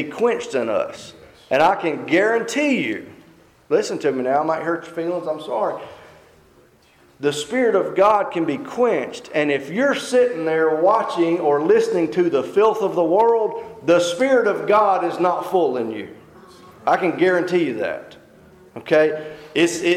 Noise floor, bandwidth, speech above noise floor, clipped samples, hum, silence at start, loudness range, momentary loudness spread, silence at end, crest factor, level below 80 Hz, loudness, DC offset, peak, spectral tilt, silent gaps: -53 dBFS; 14.5 kHz; 35 dB; under 0.1%; none; 0 s; 6 LU; 9 LU; 0 s; 14 dB; -64 dBFS; -19 LUFS; under 0.1%; -6 dBFS; -5 dB/octave; none